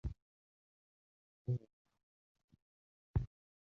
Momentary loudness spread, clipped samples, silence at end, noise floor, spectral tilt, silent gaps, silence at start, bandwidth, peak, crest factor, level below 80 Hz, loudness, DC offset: 10 LU; under 0.1%; 0.35 s; under -90 dBFS; -11 dB/octave; 0.22-1.45 s, 1.73-1.85 s, 2.03-2.35 s, 2.44-2.48 s, 2.62-3.14 s; 0.05 s; 4.2 kHz; -22 dBFS; 24 dB; -52 dBFS; -44 LUFS; under 0.1%